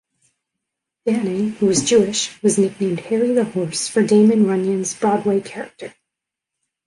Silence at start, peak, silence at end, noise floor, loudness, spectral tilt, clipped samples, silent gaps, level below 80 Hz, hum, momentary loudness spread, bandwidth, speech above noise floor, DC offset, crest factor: 1.05 s; -4 dBFS; 1 s; -83 dBFS; -18 LUFS; -4.5 dB/octave; under 0.1%; none; -60 dBFS; none; 13 LU; 11.5 kHz; 66 dB; under 0.1%; 16 dB